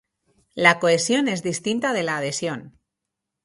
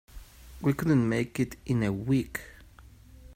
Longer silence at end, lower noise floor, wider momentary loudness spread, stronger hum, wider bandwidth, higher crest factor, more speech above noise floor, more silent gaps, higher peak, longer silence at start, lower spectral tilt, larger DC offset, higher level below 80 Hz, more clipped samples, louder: first, 0.75 s vs 0 s; first, -83 dBFS vs -52 dBFS; about the same, 12 LU vs 12 LU; neither; second, 11.5 kHz vs 16 kHz; about the same, 22 dB vs 18 dB; first, 62 dB vs 25 dB; neither; first, -2 dBFS vs -12 dBFS; first, 0.55 s vs 0.15 s; second, -3.5 dB/octave vs -7.5 dB/octave; neither; second, -66 dBFS vs -50 dBFS; neither; first, -21 LUFS vs -29 LUFS